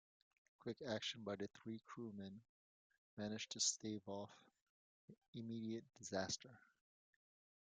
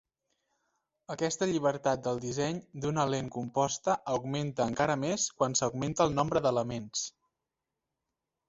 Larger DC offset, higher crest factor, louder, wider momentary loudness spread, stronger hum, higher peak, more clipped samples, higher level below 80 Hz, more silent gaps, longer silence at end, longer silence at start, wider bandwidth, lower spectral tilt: neither; about the same, 24 dB vs 22 dB; second, -47 LUFS vs -31 LUFS; first, 17 LU vs 6 LU; neither; second, -26 dBFS vs -10 dBFS; neither; second, -86 dBFS vs -62 dBFS; first, 2.49-2.90 s, 2.98-3.17 s, 4.61-5.08 s, 5.18-5.22 s, 5.28-5.33 s vs none; second, 1.15 s vs 1.4 s; second, 0.6 s vs 1.1 s; first, 9.6 kHz vs 8.2 kHz; second, -3 dB/octave vs -4.5 dB/octave